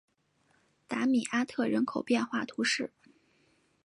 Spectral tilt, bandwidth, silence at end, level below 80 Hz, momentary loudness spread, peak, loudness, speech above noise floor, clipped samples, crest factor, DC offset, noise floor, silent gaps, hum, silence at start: -3.5 dB/octave; 11.5 kHz; 0.95 s; -78 dBFS; 5 LU; -16 dBFS; -31 LUFS; 41 dB; under 0.1%; 18 dB; under 0.1%; -71 dBFS; none; none; 0.9 s